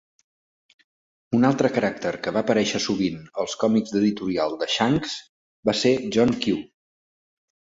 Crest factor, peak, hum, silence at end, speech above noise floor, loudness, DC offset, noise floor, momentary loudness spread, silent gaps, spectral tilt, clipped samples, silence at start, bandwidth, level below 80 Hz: 18 dB; -6 dBFS; none; 1.1 s; over 68 dB; -23 LUFS; under 0.1%; under -90 dBFS; 7 LU; 5.29-5.63 s; -5 dB/octave; under 0.1%; 1.3 s; 7.8 kHz; -58 dBFS